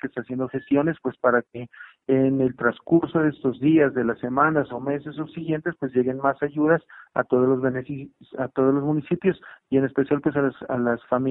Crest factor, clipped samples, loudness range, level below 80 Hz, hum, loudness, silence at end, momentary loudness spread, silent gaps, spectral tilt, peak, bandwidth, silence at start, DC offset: 18 dB; under 0.1%; 2 LU; -60 dBFS; none; -23 LUFS; 0 s; 11 LU; none; -11.5 dB/octave; -4 dBFS; 4 kHz; 0.05 s; under 0.1%